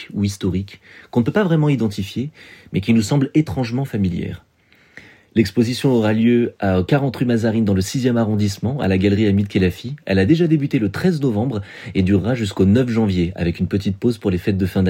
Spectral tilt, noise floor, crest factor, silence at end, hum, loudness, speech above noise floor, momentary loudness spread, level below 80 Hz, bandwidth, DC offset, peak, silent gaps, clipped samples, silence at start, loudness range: -7 dB/octave; -54 dBFS; 16 dB; 0 s; none; -19 LUFS; 37 dB; 8 LU; -46 dBFS; 16.5 kHz; under 0.1%; -2 dBFS; none; under 0.1%; 0 s; 3 LU